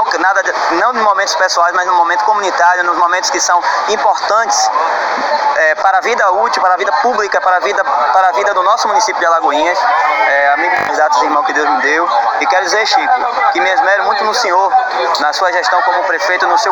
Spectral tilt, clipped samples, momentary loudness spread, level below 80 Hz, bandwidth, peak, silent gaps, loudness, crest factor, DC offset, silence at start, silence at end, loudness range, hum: 0 dB/octave; under 0.1%; 2 LU; -56 dBFS; 18 kHz; 0 dBFS; none; -11 LUFS; 12 dB; under 0.1%; 0 s; 0 s; 1 LU; none